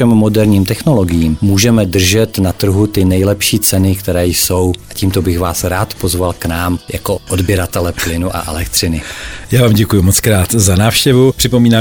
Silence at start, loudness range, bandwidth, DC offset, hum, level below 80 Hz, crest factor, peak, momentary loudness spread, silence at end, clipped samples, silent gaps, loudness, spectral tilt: 0 s; 5 LU; 19.5 kHz; 0.9%; none; -30 dBFS; 12 dB; 0 dBFS; 7 LU; 0 s; under 0.1%; none; -12 LUFS; -5 dB/octave